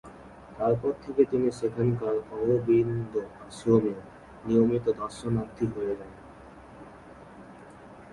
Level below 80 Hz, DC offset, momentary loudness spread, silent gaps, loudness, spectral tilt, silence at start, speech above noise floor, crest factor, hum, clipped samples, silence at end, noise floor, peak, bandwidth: -56 dBFS; under 0.1%; 24 LU; none; -27 LUFS; -8.5 dB/octave; 0.05 s; 22 dB; 20 dB; none; under 0.1%; 0 s; -48 dBFS; -8 dBFS; 11.5 kHz